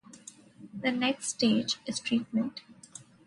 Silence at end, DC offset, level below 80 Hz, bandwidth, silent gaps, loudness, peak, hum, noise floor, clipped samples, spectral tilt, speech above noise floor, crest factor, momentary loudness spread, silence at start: 0.25 s; under 0.1%; -72 dBFS; 11.5 kHz; none; -30 LUFS; -14 dBFS; none; -52 dBFS; under 0.1%; -3.5 dB/octave; 23 dB; 18 dB; 22 LU; 0.1 s